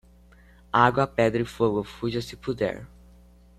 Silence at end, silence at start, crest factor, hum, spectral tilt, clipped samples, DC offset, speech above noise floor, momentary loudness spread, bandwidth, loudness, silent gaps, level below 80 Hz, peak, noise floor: 0.7 s; 0.75 s; 22 dB; 60 Hz at -45 dBFS; -6.5 dB/octave; under 0.1%; under 0.1%; 29 dB; 10 LU; 14 kHz; -25 LUFS; none; -50 dBFS; -4 dBFS; -53 dBFS